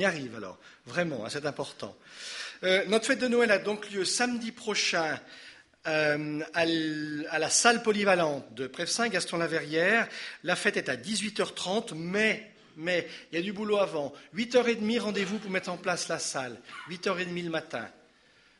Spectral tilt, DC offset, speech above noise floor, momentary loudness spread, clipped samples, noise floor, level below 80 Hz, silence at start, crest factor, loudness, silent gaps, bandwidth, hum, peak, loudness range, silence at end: -3 dB/octave; under 0.1%; 32 dB; 13 LU; under 0.1%; -62 dBFS; -74 dBFS; 0 s; 24 dB; -29 LUFS; none; 11.5 kHz; none; -6 dBFS; 4 LU; 0.65 s